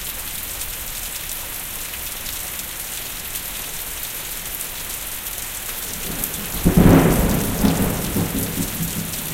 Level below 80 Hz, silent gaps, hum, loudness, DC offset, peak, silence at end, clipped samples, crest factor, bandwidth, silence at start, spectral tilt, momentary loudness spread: -32 dBFS; none; none; -22 LUFS; under 0.1%; 0 dBFS; 0 s; under 0.1%; 22 dB; 17 kHz; 0 s; -4.5 dB/octave; 10 LU